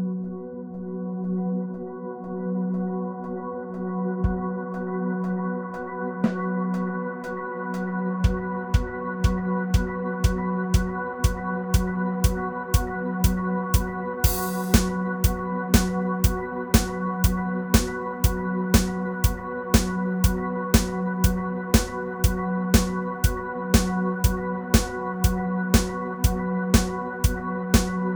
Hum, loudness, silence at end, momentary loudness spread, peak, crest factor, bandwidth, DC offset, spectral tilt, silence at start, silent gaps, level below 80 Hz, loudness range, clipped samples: none; -25 LUFS; 0 s; 9 LU; -2 dBFS; 22 dB; over 20 kHz; 0.1%; -5.5 dB/octave; 0 s; none; -30 dBFS; 5 LU; under 0.1%